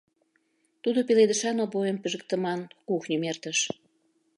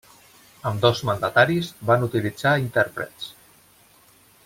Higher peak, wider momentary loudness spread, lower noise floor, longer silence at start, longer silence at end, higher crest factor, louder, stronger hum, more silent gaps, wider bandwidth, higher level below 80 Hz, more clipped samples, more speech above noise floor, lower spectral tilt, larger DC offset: second, -10 dBFS vs -4 dBFS; second, 10 LU vs 13 LU; first, -71 dBFS vs -55 dBFS; first, 0.85 s vs 0.65 s; second, 0.65 s vs 1.15 s; about the same, 18 dB vs 20 dB; second, -27 LUFS vs -22 LUFS; neither; neither; second, 11.5 kHz vs 16.5 kHz; second, -80 dBFS vs -58 dBFS; neither; first, 45 dB vs 33 dB; second, -3.5 dB/octave vs -5.5 dB/octave; neither